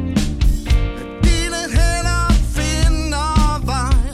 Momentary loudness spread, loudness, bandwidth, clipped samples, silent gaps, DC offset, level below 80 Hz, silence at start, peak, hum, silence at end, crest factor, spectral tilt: 3 LU; -18 LUFS; 13.5 kHz; under 0.1%; none; under 0.1%; -18 dBFS; 0 s; -2 dBFS; none; 0 s; 12 dB; -5 dB/octave